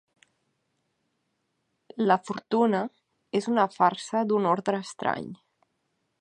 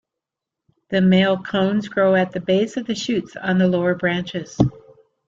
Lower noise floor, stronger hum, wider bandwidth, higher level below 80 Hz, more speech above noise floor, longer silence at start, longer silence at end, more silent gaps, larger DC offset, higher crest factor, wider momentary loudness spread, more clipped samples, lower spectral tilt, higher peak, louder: second, -77 dBFS vs -85 dBFS; neither; first, 10.5 kHz vs 7.6 kHz; second, -76 dBFS vs -50 dBFS; second, 51 dB vs 66 dB; first, 1.95 s vs 0.9 s; first, 0.85 s vs 0.5 s; neither; neither; about the same, 22 dB vs 18 dB; about the same, 9 LU vs 8 LU; neither; about the same, -6 dB/octave vs -6.5 dB/octave; second, -8 dBFS vs -2 dBFS; second, -26 LUFS vs -20 LUFS